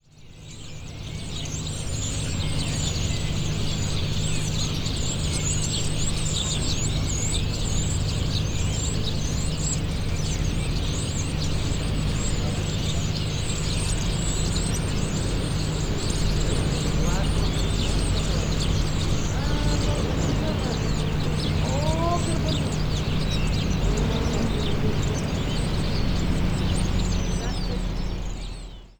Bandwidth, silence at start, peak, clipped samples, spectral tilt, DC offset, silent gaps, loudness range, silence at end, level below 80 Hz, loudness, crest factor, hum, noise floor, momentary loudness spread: over 20 kHz; 0.2 s; -10 dBFS; under 0.1%; -4.5 dB/octave; under 0.1%; none; 2 LU; 0.1 s; -30 dBFS; -26 LUFS; 14 dB; none; -44 dBFS; 4 LU